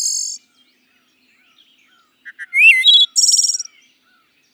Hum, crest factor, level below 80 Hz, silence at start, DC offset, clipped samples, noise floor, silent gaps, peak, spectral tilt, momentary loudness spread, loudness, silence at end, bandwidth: none; 18 dB; under -90 dBFS; 0 s; under 0.1%; under 0.1%; -59 dBFS; none; 0 dBFS; 8.5 dB/octave; 24 LU; -10 LUFS; 0.9 s; 17.5 kHz